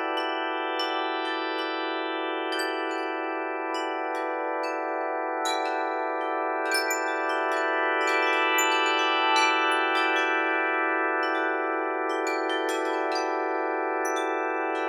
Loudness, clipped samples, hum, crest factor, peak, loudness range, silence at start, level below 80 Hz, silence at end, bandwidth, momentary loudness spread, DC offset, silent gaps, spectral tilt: -26 LUFS; under 0.1%; none; 18 dB; -10 dBFS; 6 LU; 0 s; -88 dBFS; 0 s; 16.5 kHz; 7 LU; under 0.1%; none; 1 dB/octave